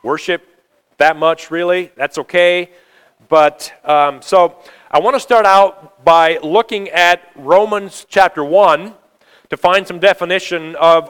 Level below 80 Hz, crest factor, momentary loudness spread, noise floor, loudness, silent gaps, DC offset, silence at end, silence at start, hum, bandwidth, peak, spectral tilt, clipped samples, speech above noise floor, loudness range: -56 dBFS; 14 dB; 9 LU; -51 dBFS; -13 LUFS; none; under 0.1%; 0 s; 0.05 s; none; 18 kHz; 0 dBFS; -3.5 dB/octave; 0.3%; 38 dB; 3 LU